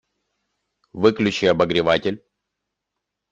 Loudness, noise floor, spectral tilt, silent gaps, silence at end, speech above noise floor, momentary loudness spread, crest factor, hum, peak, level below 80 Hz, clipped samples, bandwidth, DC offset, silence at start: -19 LUFS; -82 dBFS; -5.5 dB/octave; none; 1.15 s; 63 dB; 8 LU; 20 dB; 50 Hz at -50 dBFS; -2 dBFS; -56 dBFS; under 0.1%; 8.6 kHz; under 0.1%; 0.95 s